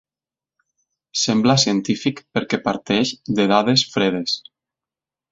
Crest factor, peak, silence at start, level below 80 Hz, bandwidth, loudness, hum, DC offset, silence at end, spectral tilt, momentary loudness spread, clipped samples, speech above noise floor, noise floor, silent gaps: 20 dB; 0 dBFS; 1.15 s; -58 dBFS; 7.8 kHz; -19 LUFS; none; under 0.1%; 0.9 s; -4 dB/octave; 8 LU; under 0.1%; over 71 dB; under -90 dBFS; none